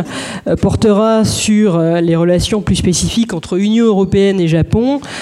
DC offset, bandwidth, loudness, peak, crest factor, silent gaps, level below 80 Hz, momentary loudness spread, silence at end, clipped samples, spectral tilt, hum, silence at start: under 0.1%; 14 kHz; -13 LUFS; -2 dBFS; 10 dB; none; -32 dBFS; 5 LU; 0 s; under 0.1%; -5.5 dB/octave; none; 0 s